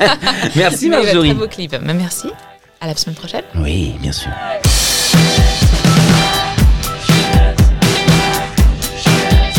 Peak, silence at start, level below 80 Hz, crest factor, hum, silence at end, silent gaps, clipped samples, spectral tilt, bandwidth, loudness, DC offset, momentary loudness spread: 0 dBFS; 0 s; -18 dBFS; 12 dB; none; 0 s; none; under 0.1%; -4.5 dB/octave; 18.5 kHz; -13 LUFS; under 0.1%; 11 LU